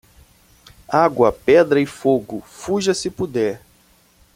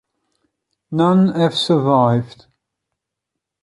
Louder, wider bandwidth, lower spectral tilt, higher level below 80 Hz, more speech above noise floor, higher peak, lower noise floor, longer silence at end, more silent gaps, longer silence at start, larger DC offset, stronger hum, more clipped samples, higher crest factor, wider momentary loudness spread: about the same, -18 LUFS vs -16 LUFS; first, 16 kHz vs 11.5 kHz; second, -5 dB/octave vs -7 dB/octave; first, -50 dBFS vs -60 dBFS; second, 37 dB vs 66 dB; about the same, -2 dBFS vs -2 dBFS; second, -55 dBFS vs -81 dBFS; second, 0.8 s vs 1.35 s; neither; about the same, 0.9 s vs 0.9 s; neither; neither; neither; about the same, 18 dB vs 16 dB; about the same, 11 LU vs 9 LU